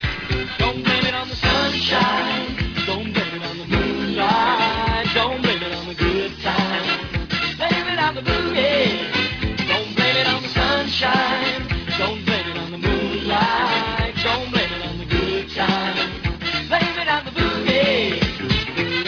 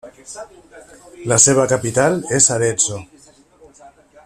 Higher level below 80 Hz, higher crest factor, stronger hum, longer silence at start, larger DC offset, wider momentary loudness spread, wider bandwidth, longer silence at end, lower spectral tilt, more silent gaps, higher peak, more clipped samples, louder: first, -34 dBFS vs -52 dBFS; about the same, 18 dB vs 20 dB; neither; about the same, 0 s vs 0.05 s; neither; second, 6 LU vs 23 LU; second, 5.4 kHz vs 15 kHz; second, 0 s vs 0.35 s; first, -5.5 dB/octave vs -3.5 dB/octave; neither; second, -4 dBFS vs 0 dBFS; neither; second, -20 LUFS vs -14 LUFS